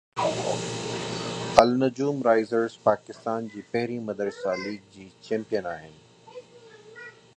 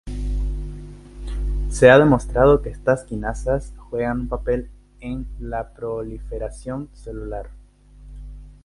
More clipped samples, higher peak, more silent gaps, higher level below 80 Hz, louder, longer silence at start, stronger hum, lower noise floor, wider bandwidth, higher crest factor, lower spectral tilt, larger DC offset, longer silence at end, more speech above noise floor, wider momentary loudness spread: neither; about the same, 0 dBFS vs 0 dBFS; neither; second, -60 dBFS vs -30 dBFS; second, -26 LUFS vs -21 LUFS; about the same, 0.15 s vs 0.05 s; second, none vs 50 Hz at -35 dBFS; first, -50 dBFS vs -46 dBFS; about the same, 11 kHz vs 11.5 kHz; first, 28 dB vs 22 dB; second, -5 dB/octave vs -6.5 dB/octave; neither; first, 0.25 s vs 0.1 s; about the same, 23 dB vs 26 dB; about the same, 23 LU vs 23 LU